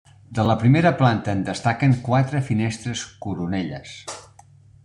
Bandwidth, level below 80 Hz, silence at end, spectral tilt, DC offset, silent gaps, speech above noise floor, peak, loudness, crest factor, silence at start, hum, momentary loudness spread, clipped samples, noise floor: 10.5 kHz; -52 dBFS; 0.65 s; -6.5 dB/octave; under 0.1%; none; 29 dB; -4 dBFS; -21 LUFS; 18 dB; 0.3 s; none; 17 LU; under 0.1%; -50 dBFS